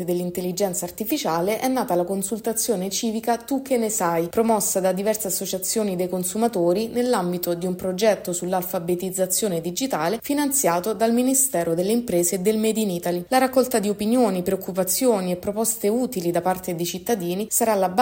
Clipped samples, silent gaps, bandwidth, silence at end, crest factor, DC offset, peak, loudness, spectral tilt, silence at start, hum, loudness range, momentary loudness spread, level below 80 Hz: under 0.1%; none; 16.5 kHz; 0 s; 16 dB; under 0.1%; -6 dBFS; -22 LUFS; -4 dB/octave; 0 s; none; 3 LU; 6 LU; -58 dBFS